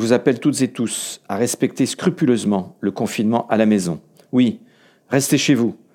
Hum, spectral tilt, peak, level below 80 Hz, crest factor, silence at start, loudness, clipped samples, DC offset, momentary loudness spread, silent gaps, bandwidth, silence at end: none; -5 dB/octave; -2 dBFS; -66 dBFS; 18 dB; 0 s; -19 LUFS; under 0.1%; under 0.1%; 8 LU; none; 17.5 kHz; 0.2 s